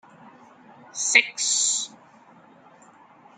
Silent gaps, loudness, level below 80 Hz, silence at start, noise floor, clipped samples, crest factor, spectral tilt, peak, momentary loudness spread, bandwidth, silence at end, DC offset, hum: none; -20 LUFS; -84 dBFS; 0.25 s; -52 dBFS; under 0.1%; 26 dB; 2.5 dB/octave; -2 dBFS; 16 LU; 10.5 kHz; 1.5 s; under 0.1%; none